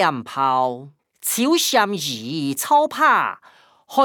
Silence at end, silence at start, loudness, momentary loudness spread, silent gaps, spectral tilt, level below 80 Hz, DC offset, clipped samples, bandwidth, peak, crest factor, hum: 0 s; 0 s; -19 LUFS; 10 LU; none; -2.5 dB/octave; -76 dBFS; under 0.1%; under 0.1%; over 20 kHz; -4 dBFS; 16 dB; none